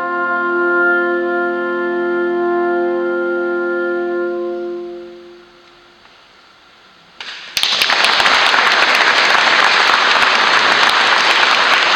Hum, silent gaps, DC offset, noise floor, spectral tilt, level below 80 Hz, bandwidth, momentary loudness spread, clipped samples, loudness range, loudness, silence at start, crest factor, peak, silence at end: none; none; under 0.1%; -46 dBFS; -1.5 dB/octave; -60 dBFS; 18 kHz; 11 LU; under 0.1%; 14 LU; -13 LUFS; 0 s; 16 dB; 0 dBFS; 0 s